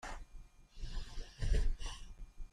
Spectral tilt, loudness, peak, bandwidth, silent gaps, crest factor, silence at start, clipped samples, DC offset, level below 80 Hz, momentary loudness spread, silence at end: -4.5 dB/octave; -44 LUFS; -22 dBFS; 10.5 kHz; none; 18 dB; 0.05 s; under 0.1%; under 0.1%; -40 dBFS; 21 LU; 0.05 s